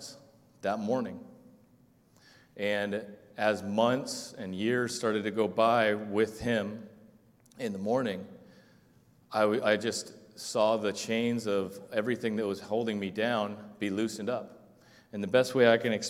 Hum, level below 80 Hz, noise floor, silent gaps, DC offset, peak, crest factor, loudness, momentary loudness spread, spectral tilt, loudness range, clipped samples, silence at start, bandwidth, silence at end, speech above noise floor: none; -68 dBFS; -63 dBFS; none; under 0.1%; -8 dBFS; 22 dB; -30 LUFS; 13 LU; -4.5 dB/octave; 5 LU; under 0.1%; 0 s; 16 kHz; 0 s; 33 dB